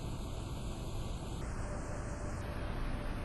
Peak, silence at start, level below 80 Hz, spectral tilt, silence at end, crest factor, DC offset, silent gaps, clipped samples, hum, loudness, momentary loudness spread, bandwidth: -26 dBFS; 0 s; -42 dBFS; -6 dB/octave; 0 s; 14 dB; under 0.1%; none; under 0.1%; none; -42 LUFS; 2 LU; 12 kHz